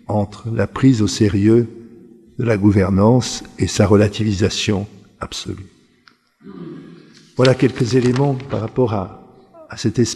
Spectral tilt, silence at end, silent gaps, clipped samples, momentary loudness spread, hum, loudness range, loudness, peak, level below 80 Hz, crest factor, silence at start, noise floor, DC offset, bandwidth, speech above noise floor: -6 dB/octave; 0 s; none; under 0.1%; 19 LU; none; 6 LU; -17 LUFS; 0 dBFS; -46 dBFS; 18 dB; 0.1 s; -54 dBFS; under 0.1%; 12.5 kHz; 38 dB